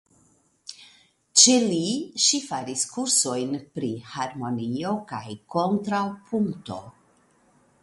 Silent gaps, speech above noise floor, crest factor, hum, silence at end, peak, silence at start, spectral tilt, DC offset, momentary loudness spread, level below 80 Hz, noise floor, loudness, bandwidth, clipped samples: none; 37 dB; 26 dB; none; 0.9 s; 0 dBFS; 0.65 s; -2.5 dB/octave; under 0.1%; 20 LU; -66 dBFS; -63 dBFS; -23 LUFS; 11.5 kHz; under 0.1%